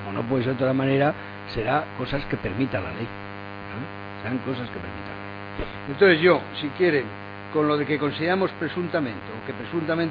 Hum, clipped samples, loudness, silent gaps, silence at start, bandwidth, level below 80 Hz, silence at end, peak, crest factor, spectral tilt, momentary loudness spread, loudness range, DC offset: none; under 0.1%; -25 LUFS; none; 0 s; 5.2 kHz; -48 dBFS; 0 s; -4 dBFS; 20 dB; -9 dB/octave; 15 LU; 8 LU; under 0.1%